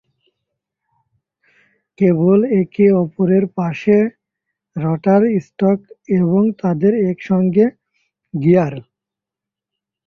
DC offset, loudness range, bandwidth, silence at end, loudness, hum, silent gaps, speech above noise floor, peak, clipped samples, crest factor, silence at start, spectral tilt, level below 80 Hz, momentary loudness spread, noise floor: under 0.1%; 2 LU; 6.2 kHz; 1.25 s; -16 LUFS; none; none; 71 dB; -2 dBFS; under 0.1%; 16 dB; 2 s; -10.5 dB/octave; -58 dBFS; 8 LU; -86 dBFS